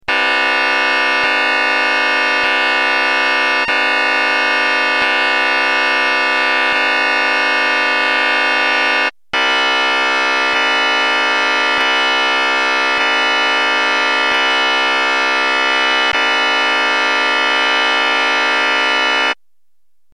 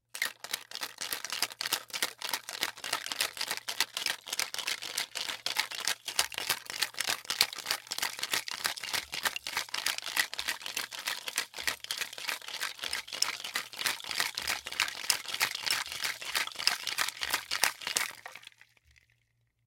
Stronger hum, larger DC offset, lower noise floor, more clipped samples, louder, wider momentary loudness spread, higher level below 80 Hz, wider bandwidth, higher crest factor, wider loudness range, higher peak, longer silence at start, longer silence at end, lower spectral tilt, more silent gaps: neither; first, 0.5% vs under 0.1%; about the same, -77 dBFS vs -75 dBFS; neither; first, -13 LUFS vs -32 LUFS; second, 1 LU vs 6 LU; first, -60 dBFS vs -72 dBFS; second, 11 kHz vs 17 kHz; second, 14 dB vs 34 dB; second, 0 LU vs 3 LU; about the same, 0 dBFS vs -2 dBFS; about the same, 0.1 s vs 0.15 s; second, 0.8 s vs 1.2 s; first, 0 dB/octave vs 1.5 dB/octave; neither